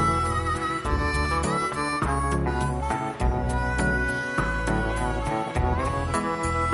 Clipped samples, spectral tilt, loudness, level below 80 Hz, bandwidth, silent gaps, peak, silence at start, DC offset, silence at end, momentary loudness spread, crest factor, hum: under 0.1%; -5.5 dB/octave; -26 LUFS; -32 dBFS; 11.5 kHz; none; -12 dBFS; 0 s; under 0.1%; 0 s; 2 LU; 12 dB; none